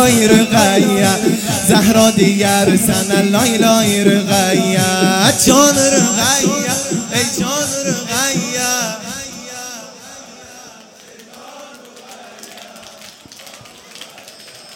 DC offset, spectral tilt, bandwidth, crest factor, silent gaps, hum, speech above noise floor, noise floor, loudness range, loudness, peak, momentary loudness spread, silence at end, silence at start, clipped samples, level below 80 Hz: under 0.1%; -3.5 dB/octave; 17 kHz; 14 dB; none; none; 28 dB; -40 dBFS; 15 LU; -12 LUFS; 0 dBFS; 24 LU; 0 s; 0 s; under 0.1%; -46 dBFS